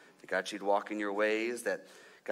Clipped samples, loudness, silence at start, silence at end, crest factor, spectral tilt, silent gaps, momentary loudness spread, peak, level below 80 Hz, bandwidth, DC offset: under 0.1%; -34 LUFS; 0.25 s; 0 s; 18 dB; -3.5 dB/octave; none; 7 LU; -16 dBFS; -86 dBFS; 16 kHz; under 0.1%